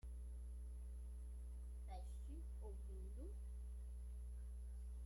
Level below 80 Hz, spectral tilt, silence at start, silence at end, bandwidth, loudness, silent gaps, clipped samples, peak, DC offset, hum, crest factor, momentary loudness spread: -50 dBFS; -7 dB/octave; 0.05 s; 0 s; 11.5 kHz; -54 LUFS; none; under 0.1%; -42 dBFS; under 0.1%; 60 Hz at -50 dBFS; 8 dB; 1 LU